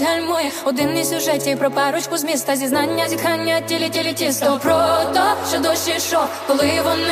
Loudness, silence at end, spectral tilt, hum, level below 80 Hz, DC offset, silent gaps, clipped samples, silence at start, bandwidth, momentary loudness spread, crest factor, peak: -18 LUFS; 0 s; -3 dB/octave; none; -58 dBFS; under 0.1%; none; under 0.1%; 0 s; 15.5 kHz; 4 LU; 14 dB; -4 dBFS